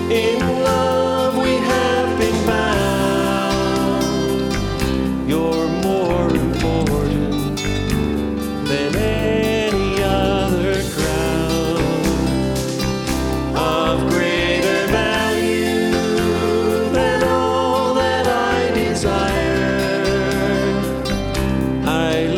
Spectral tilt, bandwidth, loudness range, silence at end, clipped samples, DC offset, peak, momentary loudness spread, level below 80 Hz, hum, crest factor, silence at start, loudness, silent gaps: -5.5 dB/octave; 18.5 kHz; 2 LU; 0 s; under 0.1%; under 0.1%; -4 dBFS; 4 LU; -30 dBFS; none; 14 dB; 0 s; -18 LUFS; none